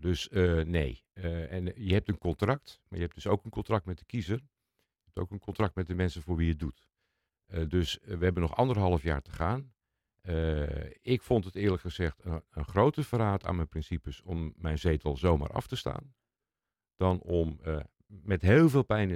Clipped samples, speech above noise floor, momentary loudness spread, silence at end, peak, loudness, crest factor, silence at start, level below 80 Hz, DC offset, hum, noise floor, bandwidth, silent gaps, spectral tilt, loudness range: under 0.1%; over 60 dB; 11 LU; 0 s; -10 dBFS; -31 LUFS; 20 dB; 0 s; -46 dBFS; under 0.1%; none; under -90 dBFS; 14.5 kHz; none; -7.5 dB/octave; 4 LU